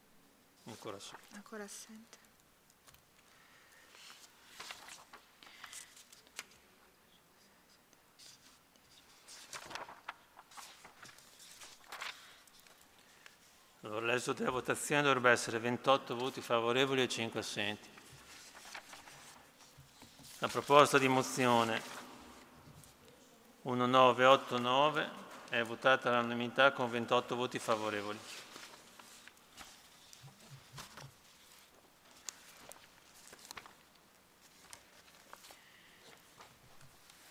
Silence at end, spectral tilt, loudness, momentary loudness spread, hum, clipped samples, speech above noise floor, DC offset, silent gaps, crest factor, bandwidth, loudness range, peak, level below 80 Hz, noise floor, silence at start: 0.45 s; -3.5 dB/octave; -32 LUFS; 27 LU; none; under 0.1%; 35 dB; under 0.1%; none; 28 dB; 16.5 kHz; 23 LU; -10 dBFS; -78 dBFS; -67 dBFS; 0.65 s